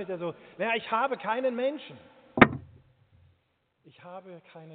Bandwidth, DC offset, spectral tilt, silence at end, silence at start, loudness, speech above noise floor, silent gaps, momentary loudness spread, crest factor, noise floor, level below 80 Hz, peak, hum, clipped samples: 4.6 kHz; under 0.1%; -4 dB/octave; 0 s; 0 s; -27 LUFS; 41 dB; none; 25 LU; 28 dB; -73 dBFS; -56 dBFS; -2 dBFS; none; under 0.1%